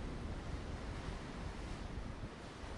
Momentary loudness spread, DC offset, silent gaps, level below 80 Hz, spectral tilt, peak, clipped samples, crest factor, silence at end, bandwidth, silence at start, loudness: 3 LU; under 0.1%; none; -48 dBFS; -6 dB/octave; -32 dBFS; under 0.1%; 12 dB; 0 s; 11.5 kHz; 0 s; -47 LUFS